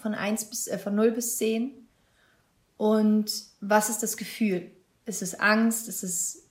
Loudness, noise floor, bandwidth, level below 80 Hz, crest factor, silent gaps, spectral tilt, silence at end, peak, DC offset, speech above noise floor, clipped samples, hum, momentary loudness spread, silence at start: -27 LUFS; -66 dBFS; 16 kHz; -74 dBFS; 18 dB; none; -3.5 dB/octave; 0.1 s; -8 dBFS; under 0.1%; 40 dB; under 0.1%; none; 10 LU; 0 s